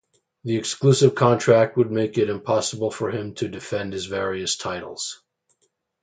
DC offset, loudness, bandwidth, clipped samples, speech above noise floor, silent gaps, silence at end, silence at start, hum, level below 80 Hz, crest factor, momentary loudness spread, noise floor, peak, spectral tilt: under 0.1%; -22 LUFS; 9.6 kHz; under 0.1%; 49 dB; none; 0.85 s; 0.45 s; none; -58 dBFS; 20 dB; 13 LU; -71 dBFS; -2 dBFS; -5 dB/octave